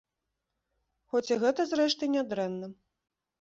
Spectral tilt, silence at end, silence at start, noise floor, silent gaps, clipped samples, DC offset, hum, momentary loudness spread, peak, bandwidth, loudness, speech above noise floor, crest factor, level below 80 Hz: -4.5 dB/octave; 0.7 s; 1.15 s; -85 dBFS; none; under 0.1%; under 0.1%; none; 9 LU; -14 dBFS; 7.8 kHz; -29 LUFS; 56 dB; 18 dB; -74 dBFS